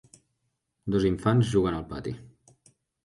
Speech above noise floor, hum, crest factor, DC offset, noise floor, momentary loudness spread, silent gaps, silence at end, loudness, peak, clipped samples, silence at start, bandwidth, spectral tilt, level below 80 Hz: 53 dB; none; 18 dB; under 0.1%; -78 dBFS; 16 LU; none; 0.8 s; -27 LUFS; -10 dBFS; under 0.1%; 0.85 s; 11.5 kHz; -7.5 dB/octave; -48 dBFS